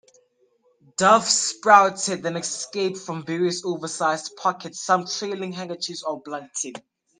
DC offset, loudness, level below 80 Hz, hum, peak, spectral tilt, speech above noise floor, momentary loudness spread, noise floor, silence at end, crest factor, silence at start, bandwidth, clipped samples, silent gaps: under 0.1%; -22 LUFS; -74 dBFS; none; 0 dBFS; -2.5 dB/octave; 41 dB; 16 LU; -64 dBFS; 0.4 s; 24 dB; 1 s; 10.5 kHz; under 0.1%; none